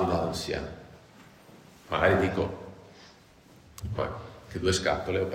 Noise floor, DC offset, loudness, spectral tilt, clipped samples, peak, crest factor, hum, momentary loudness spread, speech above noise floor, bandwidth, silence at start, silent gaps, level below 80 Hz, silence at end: -55 dBFS; under 0.1%; -29 LUFS; -5 dB/octave; under 0.1%; -10 dBFS; 22 dB; none; 24 LU; 27 dB; 16 kHz; 0 s; none; -48 dBFS; 0 s